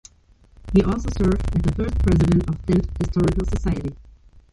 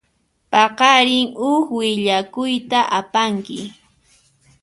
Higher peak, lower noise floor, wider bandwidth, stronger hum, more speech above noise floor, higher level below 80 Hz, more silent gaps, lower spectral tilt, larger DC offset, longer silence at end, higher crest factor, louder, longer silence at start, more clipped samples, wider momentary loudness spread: second, -4 dBFS vs 0 dBFS; second, -54 dBFS vs -65 dBFS; about the same, 11.5 kHz vs 11.5 kHz; neither; second, 34 dB vs 48 dB; first, -28 dBFS vs -62 dBFS; neither; first, -8 dB/octave vs -3.5 dB/octave; neither; second, 0.15 s vs 0.9 s; about the same, 16 dB vs 18 dB; second, -21 LUFS vs -17 LUFS; first, 0.65 s vs 0.5 s; neither; second, 6 LU vs 12 LU